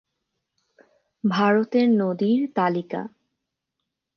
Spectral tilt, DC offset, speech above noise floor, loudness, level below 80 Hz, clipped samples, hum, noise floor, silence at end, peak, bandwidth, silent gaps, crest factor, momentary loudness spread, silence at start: -8 dB/octave; under 0.1%; 61 dB; -22 LUFS; -76 dBFS; under 0.1%; none; -82 dBFS; 1.1 s; -8 dBFS; 6.4 kHz; none; 18 dB; 12 LU; 1.25 s